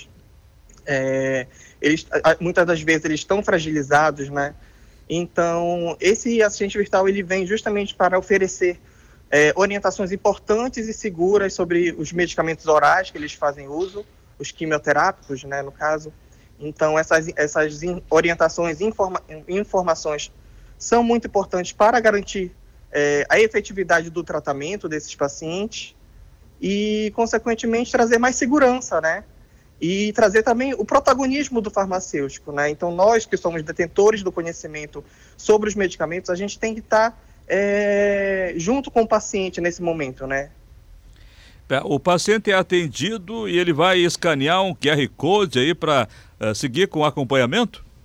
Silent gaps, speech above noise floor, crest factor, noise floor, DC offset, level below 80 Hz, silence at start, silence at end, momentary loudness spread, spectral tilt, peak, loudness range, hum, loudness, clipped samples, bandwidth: none; 30 dB; 14 dB; -50 dBFS; under 0.1%; -48 dBFS; 0 s; 0.25 s; 11 LU; -4.5 dB/octave; -6 dBFS; 4 LU; none; -20 LUFS; under 0.1%; 14 kHz